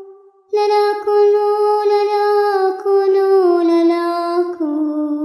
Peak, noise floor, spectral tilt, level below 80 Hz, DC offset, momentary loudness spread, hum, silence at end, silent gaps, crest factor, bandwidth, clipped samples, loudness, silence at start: -4 dBFS; -43 dBFS; -3.5 dB/octave; -78 dBFS; under 0.1%; 6 LU; none; 0 s; none; 10 dB; 12 kHz; under 0.1%; -15 LUFS; 0 s